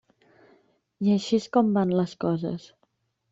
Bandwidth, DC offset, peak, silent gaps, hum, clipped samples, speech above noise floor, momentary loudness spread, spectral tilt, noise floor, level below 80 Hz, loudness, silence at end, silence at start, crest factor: 7.8 kHz; under 0.1%; -8 dBFS; none; none; under 0.1%; 48 dB; 8 LU; -7 dB/octave; -72 dBFS; -66 dBFS; -25 LUFS; 0.75 s; 1 s; 18 dB